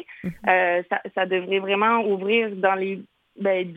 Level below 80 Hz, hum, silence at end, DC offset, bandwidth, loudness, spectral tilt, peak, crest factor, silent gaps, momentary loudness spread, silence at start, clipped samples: -64 dBFS; none; 0 s; under 0.1%; 4.7 kHz; -22 LUFS; -7.5 dB/octave; -4 dBFS; 18 dB; none; 8 LU; 0.1 s; under 0.1%